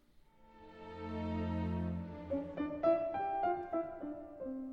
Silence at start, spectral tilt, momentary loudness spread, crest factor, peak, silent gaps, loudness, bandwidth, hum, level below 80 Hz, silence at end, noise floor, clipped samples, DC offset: 0.15 s; -9.5 dB/octave; 13 LU; 18 dB; -20 dBFS; none; -38 LUFS; 6.2 kHz; none; -58 dBFS; 0 s; -63 dBFS; under 0.1%; under 0.1%